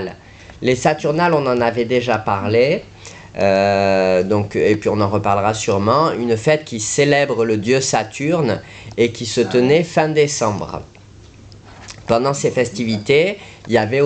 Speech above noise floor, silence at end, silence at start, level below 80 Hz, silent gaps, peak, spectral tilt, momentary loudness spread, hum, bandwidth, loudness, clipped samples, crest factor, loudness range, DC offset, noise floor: 26 dB; 0 s; 0 s; -48 dBFS; none; -2 dBFS; -5 dB/octave; 8 LU; none; 9.2 kHz; -17 LUFS; under 0.1%; 14 dB; 3 LU; under 0.1%; -42 dBFS